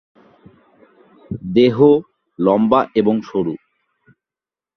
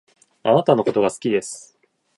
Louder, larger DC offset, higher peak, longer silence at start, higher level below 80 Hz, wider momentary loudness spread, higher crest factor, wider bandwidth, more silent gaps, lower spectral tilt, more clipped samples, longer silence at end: first, -16 LUFS vs -19 LUFS; neither; about the same, 0 dBFS vs -2 dBFS; first, 1.3 s vs 0.45 s; first, -54 dBFS vs -64 dBFS; about the same, 16 LU vs 15 LU; about the same, 18 dB vs 20 dB; second, 6.2 kHz vs 11.5 kHz; neither; first, -9 dB/octave vs -5.5 dB/octave; neither; first, 1.2 s vs 0.6 s